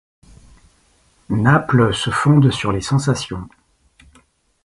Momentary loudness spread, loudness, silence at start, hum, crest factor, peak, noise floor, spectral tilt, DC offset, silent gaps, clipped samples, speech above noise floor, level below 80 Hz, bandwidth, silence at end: 10 LU; -17 LUFS; 1.3 s; none; 18 dB; 0 dBFS; -57 dBFS; -6 dB/octave; under 0.1%; none; under 0.1%; 41 dB; -44 dBFS; 11.5 kHz; 1.15 s